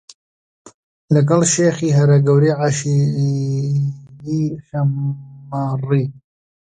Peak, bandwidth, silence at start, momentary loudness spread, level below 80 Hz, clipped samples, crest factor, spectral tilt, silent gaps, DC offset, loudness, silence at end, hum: -2 dBFS; 9.6 kHz; 0.65 s; 12 LU; -56 dBFS; under 0.1%; 16 dB; -6.5 dB/octave; 0.74-1.08 s; under 0.1%; -17 LUFS; 0.5 s; none